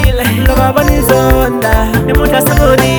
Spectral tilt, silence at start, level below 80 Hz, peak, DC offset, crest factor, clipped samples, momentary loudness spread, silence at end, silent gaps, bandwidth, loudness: -5.5 dB/octave; 0 s; -14 dBFS; 0 dBFS; under 0.1%; 8 dB; 0.6%; 3 LU; 0 s; none; over 20 kHz; -10 LUFS